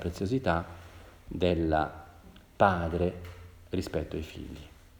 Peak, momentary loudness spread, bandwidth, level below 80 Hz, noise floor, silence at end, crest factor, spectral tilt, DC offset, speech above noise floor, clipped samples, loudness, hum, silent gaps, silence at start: -8 dBFS; 22 LU; over 20 kHz; -50 dBFS; -53 dBFS; 0.3 s; 24 dB; -7 dB/octave; under 0.1%; 23 dB; under 0.1%; -30 LUFS; none; none; 0 s